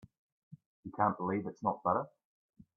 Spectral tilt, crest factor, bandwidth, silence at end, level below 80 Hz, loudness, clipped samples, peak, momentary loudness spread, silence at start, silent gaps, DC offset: -10 dB/octave; 20 dB; 6.6 kHz; 0.7 s; -74 dBFS; -34 LUFS; under 0.1%; -16 dBFS; 16 LU; 0.5 s; 0.66-0.83 s; under 0.1%